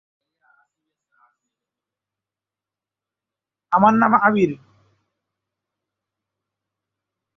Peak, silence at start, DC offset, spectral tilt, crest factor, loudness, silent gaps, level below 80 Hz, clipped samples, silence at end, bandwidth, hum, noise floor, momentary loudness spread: -2 dBFS; 3.7 s; under 0.1%; -8 dB/octave; 22 dB; -17 LUFS; none; -66 dBFS; under 0.1%; 2.8 s; 6.2 kHz; none; -89 dBFS; 8 LU